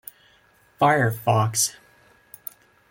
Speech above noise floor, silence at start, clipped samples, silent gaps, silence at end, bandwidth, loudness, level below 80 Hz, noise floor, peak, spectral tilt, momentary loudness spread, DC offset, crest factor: 38 dB; 0.8 s; under 0.1%; none; 1.2 s; 17 kHz; -21 LUFS; -62 dBFS; -59 dBFS; -6 dBFS; -4 dB/octave; 20 LU; under 0.1%; 20 dB